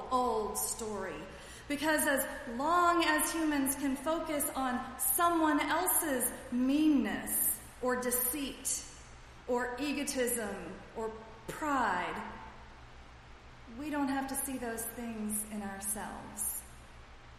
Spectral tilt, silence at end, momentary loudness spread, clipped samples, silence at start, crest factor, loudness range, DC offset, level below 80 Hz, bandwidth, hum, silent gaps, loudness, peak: -2.5 dB/octave; 0 s; 16 LU; under 0.1%; 0 s; 18 dB; 8 LU; under 0.1%; -56 dBFS; 15 kHz; none; none; -33 LUFS; -16 dBFS